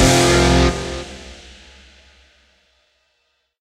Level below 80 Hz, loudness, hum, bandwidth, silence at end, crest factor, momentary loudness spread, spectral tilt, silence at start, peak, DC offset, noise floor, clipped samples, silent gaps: -28 dBFS; -15 LUFS; none; 15.5 kHz; 2.25 s; 18 dB; 25 LU; -4 dB/octave; 0 s; 0 dBFS; under 0.1%; -68 dBFS; under 0.1%; none